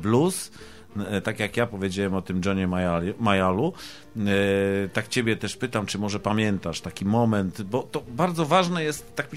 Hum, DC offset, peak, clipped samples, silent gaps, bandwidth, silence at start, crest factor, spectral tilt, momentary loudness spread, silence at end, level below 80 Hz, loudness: none; 0.3%; -4 dBFS; under 0.1%; none; 15.5 kHz; 0 s; 20 dB; -5.5 dB/octave; 8 LU; 0 s; -54 dBFS; -25 LUFS